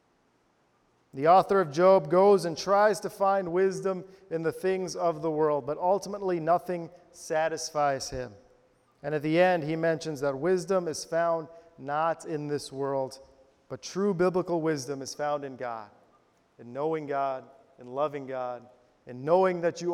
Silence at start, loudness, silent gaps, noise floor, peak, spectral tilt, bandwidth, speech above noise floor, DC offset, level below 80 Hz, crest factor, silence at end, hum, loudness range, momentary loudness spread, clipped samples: 1.15 s; -28 LUFS; none; -68 dBFS; -10 dBFS; -5.5 dB/octave; 15 kHz; 41 dB; under 0.1%; -64 dBFS; 20 dB; 0 s; none; 9 LU; 16 LU; under 0.1%